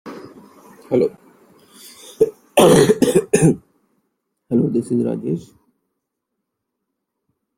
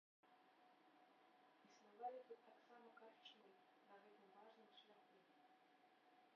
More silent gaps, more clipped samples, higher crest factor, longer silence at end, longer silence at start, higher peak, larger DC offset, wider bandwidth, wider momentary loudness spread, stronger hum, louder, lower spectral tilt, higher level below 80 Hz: neither; neither; second, 18 dB vs 24 dB; first, 2.2 s vs 0 s; second, 0.05 s vs 0.25 s; first, 0 dBFS vs -42 dBFS; neither; first, 16.5 kHz vs 6 kHz; first, 18 LU vs 13 LU; neither; first, -17 LUFS vs -63 LUFS; first, -5.5 dB/octave vs -1 dB/octave; first, -54 dBFS vs under -90 dBFS